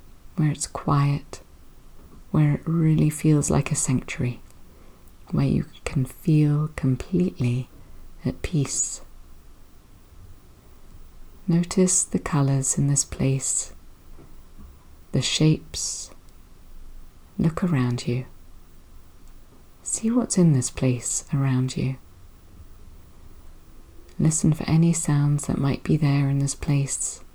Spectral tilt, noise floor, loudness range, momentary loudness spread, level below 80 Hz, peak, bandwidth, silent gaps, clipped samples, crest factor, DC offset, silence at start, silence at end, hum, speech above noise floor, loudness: -5.5 dB/octave; -48 dBFS; 6 LU; 10 LU; -44 dBFS; -8 dBFS; over 20 kHz; none; under 0.1%; 18 dB; under 0.1%; 0.05 s; 0.05 s; none; 26 dB; -23 LUFS